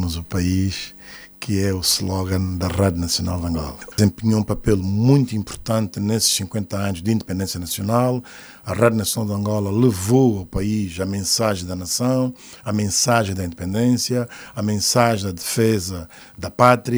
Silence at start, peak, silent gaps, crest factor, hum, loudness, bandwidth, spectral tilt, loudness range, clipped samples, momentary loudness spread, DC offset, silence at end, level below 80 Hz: 0 s; 0 dBFS; none; 20 dB; none; -20 LUFS; over 20 kHz; -5 dB/octave; 2 LU; under 0.1%; 11 LU; under 0.1%; 0 s; -44 dBFS